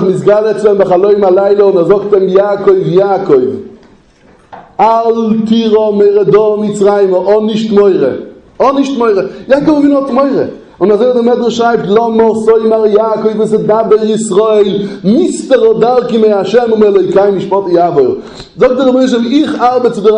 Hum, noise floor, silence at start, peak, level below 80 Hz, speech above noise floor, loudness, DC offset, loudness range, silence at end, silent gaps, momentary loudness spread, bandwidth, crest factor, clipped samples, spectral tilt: none; -43 dBFS; 0 s; 0 dBFS; -48 dBFS; 35 dB; -9 LUFS; under 0.1%; 2 LU; 0 s; none; 4 LU; 9.8 kHz; 8 dB; 0.4%; -6.5 dB/octave